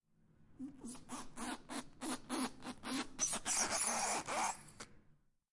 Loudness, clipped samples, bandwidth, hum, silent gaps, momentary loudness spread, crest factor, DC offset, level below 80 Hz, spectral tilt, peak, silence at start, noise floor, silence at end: -40 LUFS; under 0.1%; 11.5 kHz; none; none; 18 LU; 20 dB; under 0.1%; -64 dBFS; -1 dB/octave; -22 dBFS; 0.4 s; -70 dBFS; 0.4 s